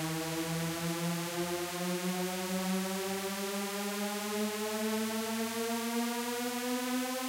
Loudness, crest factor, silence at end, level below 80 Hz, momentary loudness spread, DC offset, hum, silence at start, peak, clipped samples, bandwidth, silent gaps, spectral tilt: -34 LUFS; 14 dB; 0 s; -72 dBFS; 2 LU; under 0.1%; none; 0 s; -20 dBFS; under 0.1%; 16 kHz; none; -4 dB/octave